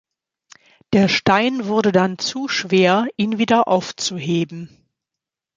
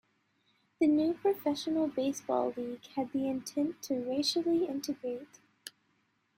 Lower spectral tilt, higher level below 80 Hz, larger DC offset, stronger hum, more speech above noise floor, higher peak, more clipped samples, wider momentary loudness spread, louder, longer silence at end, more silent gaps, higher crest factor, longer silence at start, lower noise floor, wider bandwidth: about the same, -5 dB/octave vs -4 dB/octave; first, -58 dBFS vs -76 dBFS; neither; neither; first, 68 dB vs 43 dB; first, -2 dBFS vs -16 dBFS; neither; second, 8 LU vs 12 LU; first, -18 LUFS vs -32 LUFS; first, 0.9 s vs 0.7 s; neither; about the same, 18 dB vs 16 dB; about the same, 0.9 s vs 0.8 s; first, -86 dBFS vs -75 dBFS; second, 7.8 kHz vs 16 kHz